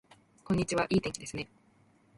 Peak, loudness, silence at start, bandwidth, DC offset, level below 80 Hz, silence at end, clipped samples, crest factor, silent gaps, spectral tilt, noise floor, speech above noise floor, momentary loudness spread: -16 dBFS; -32 LUFS; 0.45 s; 11.5 kHz; under 0.1%; -56 dBFS; 0.7 s; under 0.1%; 18 dB; none; -5 dB/octave; -65 dBFS; 34 dB; 12 LU